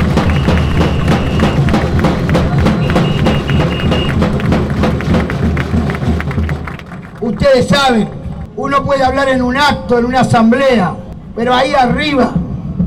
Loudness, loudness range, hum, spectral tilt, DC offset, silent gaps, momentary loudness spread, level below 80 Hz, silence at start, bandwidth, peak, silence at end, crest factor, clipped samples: -13 LUFS; 3 LU; none; -6.5 dB/octave; under 0.1%; none; 10 LU; -24 dBFS; 0 s; 14.5 kHz; -4 dBFS; 0 s; 8 dB; under 0.1%